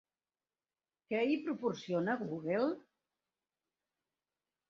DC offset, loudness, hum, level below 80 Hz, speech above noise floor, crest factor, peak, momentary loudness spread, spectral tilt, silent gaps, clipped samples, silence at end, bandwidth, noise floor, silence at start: under 0.1%; -36 LUFS; none; -82 dBFS; over 55 dB; 18 dB; -20 dBFS; 4 LU; -5 dB/octave; none; under 0.1%; 1.9 s; 7.2 kHz; under -90 dBFS; 1.1 s